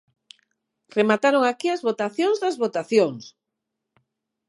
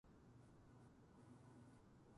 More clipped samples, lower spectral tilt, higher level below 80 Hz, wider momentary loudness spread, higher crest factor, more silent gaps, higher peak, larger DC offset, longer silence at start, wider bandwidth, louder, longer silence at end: neither; second, -5 dB/octave vs -7 dB/octave; about the same, -80 dBFS vs -78 dBFS; first, 7 LU vs 3 LU; first, 20 dB vs 14 dB; neither; first, -4 dBFS vs -52 dBFS; neither; first, 0.95 s vs 0.05 s; about the same, 11.5 kHz vs 11 kHz; first, -22 LUFS vs -67 LUFS; first, 1.2 s vs 0 s